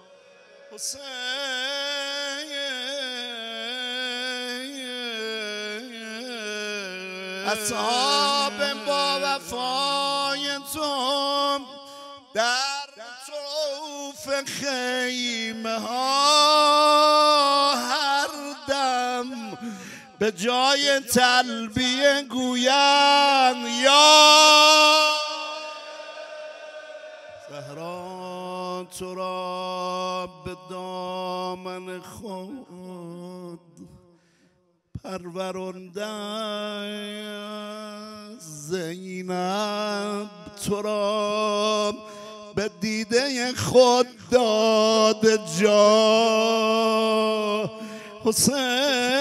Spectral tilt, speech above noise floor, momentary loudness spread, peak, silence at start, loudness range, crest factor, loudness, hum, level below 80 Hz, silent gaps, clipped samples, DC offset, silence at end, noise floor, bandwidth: -2 dB/octave; 43 dB; 21 LU; -2 dBFS; 0.7 s; 18 LU; 22 dB; -21 LUFS; none; -62 dBFS; none; under 0.1%; under 0.1%; 0 s; -65 dBFS; 16 kHz